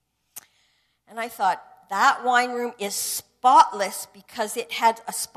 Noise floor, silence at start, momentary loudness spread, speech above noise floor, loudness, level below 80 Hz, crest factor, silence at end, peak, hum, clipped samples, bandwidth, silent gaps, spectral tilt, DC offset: -67 dBFS; 0.35 s; 16 LU; 44 dB; -22 LUFS; -72 dBFS; 20 dB; 0.1 s; -4 dBFS; none; under 0.1%; 14 kHz; none; -1 dB/octave; under 0.1%